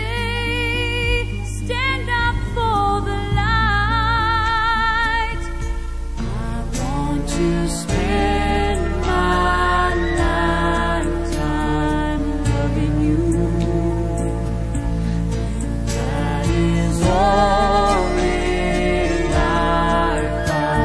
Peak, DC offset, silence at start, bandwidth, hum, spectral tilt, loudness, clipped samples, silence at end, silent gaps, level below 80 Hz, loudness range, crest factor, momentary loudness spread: -4 dBFS; 0.9%; 0 s; 11 kHz; none; -5.5 dB/octave; -19 LUFS; under 0.1%; 0 s; none; -24 dBFS; 4 LU; 14 dB; 7 LU